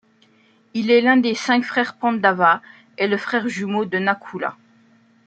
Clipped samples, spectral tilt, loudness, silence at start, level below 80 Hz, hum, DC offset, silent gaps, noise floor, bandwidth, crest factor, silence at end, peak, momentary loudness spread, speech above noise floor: under 0.1%; -5 dB/octave; -19 LUFS; 0.75 s; -72 dBFS; none; under 0.1%; none; -57 dBFS; 8.8 kHz; 20 dB; 0.75 s; -2 dBFS; 11 LU; 38 dB